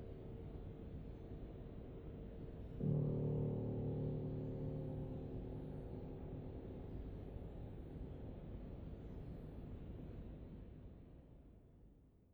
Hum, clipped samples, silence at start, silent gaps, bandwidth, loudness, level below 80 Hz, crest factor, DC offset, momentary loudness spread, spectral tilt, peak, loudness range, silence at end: none; under 0.1%; 0 s; none; 4.3 kHz; -48 LUFS; -56 dBFS; 18 dB; under 0.1%; 17 LU; -11 dB/octave; -28 dBFS; 11 LU; 0 s